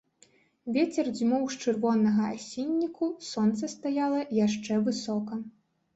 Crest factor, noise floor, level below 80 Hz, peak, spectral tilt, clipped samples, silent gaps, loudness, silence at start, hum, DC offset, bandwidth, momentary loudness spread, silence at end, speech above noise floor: 14 dB; -63 dBFS; -70 dBFS; -14 dBFS; -5.5 dB/octave; under 0.1%; none; -29 LUFS; 0.65 s; none; under 0.1%; 8 kHz; 7 LU; 0.45 s; 35 dB